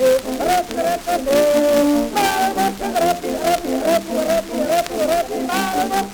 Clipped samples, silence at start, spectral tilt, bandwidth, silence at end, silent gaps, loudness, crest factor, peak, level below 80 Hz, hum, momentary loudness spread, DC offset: under 0.1%; 0 s; -3.5 dB/octave; over 20 kHz; 0 s; none; -18 LUFS; 16 dB; -2 dBFS; -44 dBFS; none; 5 LU; under 0.1%